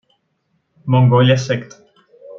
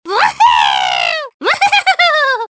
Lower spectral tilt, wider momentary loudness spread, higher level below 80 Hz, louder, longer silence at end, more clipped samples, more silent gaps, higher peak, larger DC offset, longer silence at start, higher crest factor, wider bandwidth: first, -7 dB/octave vs -0.5 dB/octave; first, 12 LU vs 6 LU; about the same, -58 dBFS vs -54 dBFS; second, -15 LUFS vs -11 LUFS; about the same, 0 s vs 0.05 s; neither; second, none vs 1.34-1.40 s; about the same, -2 dBFS vs 0 dBFS; neither; first, 0.85 s vs 0.05 s; about the same, 16 dB vs 12 dB; second, 7 kHz vs 8 kHz